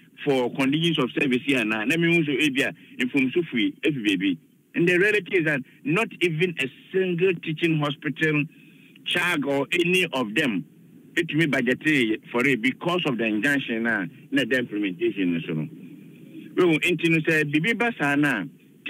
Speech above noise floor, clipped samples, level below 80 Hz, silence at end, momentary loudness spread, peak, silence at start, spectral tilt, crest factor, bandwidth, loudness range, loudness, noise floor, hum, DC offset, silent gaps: 21 dB; under 0.1%; -70 dBFS; 0 s; 7 LU; -8 dBFS; 0.2 s; -5.5 dB/octave; 16 dB; 16 kHz; 2 LU; -23 LUFS; -44 dBFS; none; under 0.1%; none